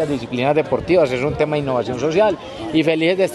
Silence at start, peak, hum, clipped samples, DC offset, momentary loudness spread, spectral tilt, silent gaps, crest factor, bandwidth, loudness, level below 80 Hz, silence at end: 0 s; -2 dBFS; none; under 0.1%; under 0.1%; 5 LU; -6.5 dB/octave; none; 16 dB; 12.5 kHz; -18 LUFS; -46 dBFS; 0 s